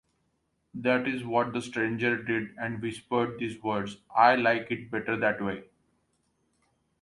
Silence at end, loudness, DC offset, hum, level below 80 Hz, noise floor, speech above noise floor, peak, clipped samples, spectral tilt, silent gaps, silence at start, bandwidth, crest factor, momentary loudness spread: 1.4 s; -28 LUFS; under 0.1%; none; -66 dBFS; -75 dBFS; 47 dB; -8 dBFS; under 0.1%; -6 dB/octave; none; 0.75 s; 11.5 kHz; 22 dB; 11 LU